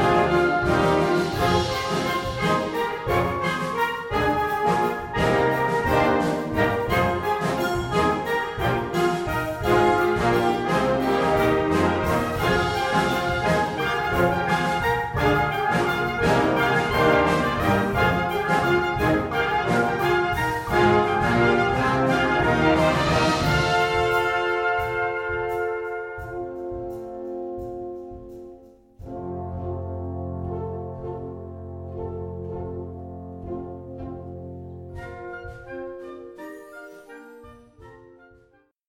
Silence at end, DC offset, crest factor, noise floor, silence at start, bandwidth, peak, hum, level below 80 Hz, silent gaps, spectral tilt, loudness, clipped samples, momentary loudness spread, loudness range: 0.8 s; under 0.1%; 16 dB; -60 dBFS; 0 s; 17 kHz; -6 dBFS; none; -42 dBFS; none; -6 dB/octave; -22 LUFS; under 0.1%; 17 LU; 15 LU